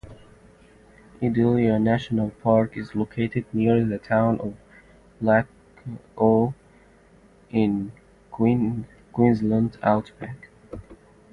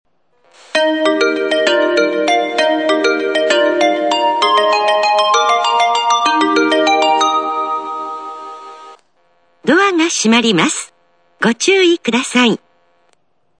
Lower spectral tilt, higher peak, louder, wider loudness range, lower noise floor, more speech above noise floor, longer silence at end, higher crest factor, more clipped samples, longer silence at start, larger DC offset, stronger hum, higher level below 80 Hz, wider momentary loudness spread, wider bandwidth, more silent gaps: first, -9.5 dB/octave vs -3 dB/octave; second, -4 dBFS vs 0 dBFS; second, -23 LUFS vs -13 LUFS; about the same, 3 LU vs 4 LU; second, -54 dBFS vs -61 dBFS; second, 32 dB vs 48 dB; second, 0.4 s vs 1.05 s; first, 20 dB vs 14 dB; neither; second, 0.05 s vs 0.75 s; second, under 0.1% vs 0.1%; neither; first, -52 dBFS vs -66 dBFS; first, 19 LU vs 11 LU; second, 6.6 kHz vs 9.8 kHz; neither